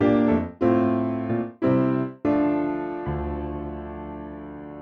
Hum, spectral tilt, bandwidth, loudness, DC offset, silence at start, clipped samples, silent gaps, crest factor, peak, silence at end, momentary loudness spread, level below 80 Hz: none; -10 dB/octave; 5.2 kHz; -24 LUFS; under 0.1%; 0 s; under 0.1%; none; 16 dB; -8 dBFS; 0 s; 15 LU; -42 dBFS